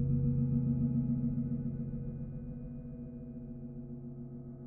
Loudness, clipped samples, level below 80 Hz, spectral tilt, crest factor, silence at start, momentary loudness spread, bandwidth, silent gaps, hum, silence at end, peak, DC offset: -37 LUFS; under 0.1%; -48 dBFS; -14.5 dB/octave; 14 dB; 0 s; 14 LU; 1.6 kHz; none; none; 0 s; -20 dBFS; under 0.1%